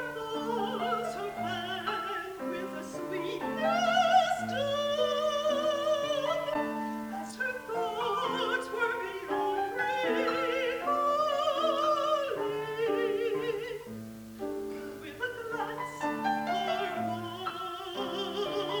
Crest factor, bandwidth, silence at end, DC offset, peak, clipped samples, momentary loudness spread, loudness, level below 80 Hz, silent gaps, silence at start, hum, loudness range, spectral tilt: 18 dB; over 20 kHz; 0 s; under 0.1%; -14 dBFS; under 0.1%; 9 LU; -31 LUFS; -66 dBFS; none; 0 s; none; 6 LU; -4 dB/octave